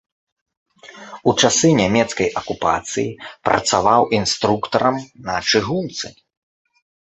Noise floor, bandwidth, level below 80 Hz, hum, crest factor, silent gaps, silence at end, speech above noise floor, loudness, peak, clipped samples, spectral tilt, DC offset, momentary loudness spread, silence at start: -39 dBFS; 8.4 kHz; -50 dBFS; none; 18 dB; none; 1 s; 21 dB; -18 LUFS; -2 dBFS; under 0.1%; -3.5 dB/octave; under 0.1%; 12 LU; 0.85 s